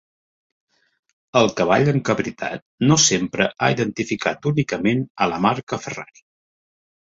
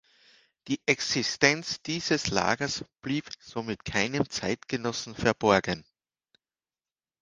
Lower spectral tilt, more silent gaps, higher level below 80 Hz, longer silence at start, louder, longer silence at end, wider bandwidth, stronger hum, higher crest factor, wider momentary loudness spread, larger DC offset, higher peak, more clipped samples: about the same, -4 dB/octave vs -3.5 dB/octave; first, 2.62-2.78 s, 5.10-5.15 s, 5.63-5.67 s vs none; about the same, -56 dBFS vs -58 dBFS; first, 1.35 s vs 0.65 s; first, -20 LUFS vs -28 LUFS; second, 1.15 s vs 1.4 s; second, 7.8 kHz vs 10.5 kHz; neither; second, 20 dB vs 28 dB; about the same, 12 LU vs 11 LU; neither; about the same, -2 dBFS vs -2 dBFS; neither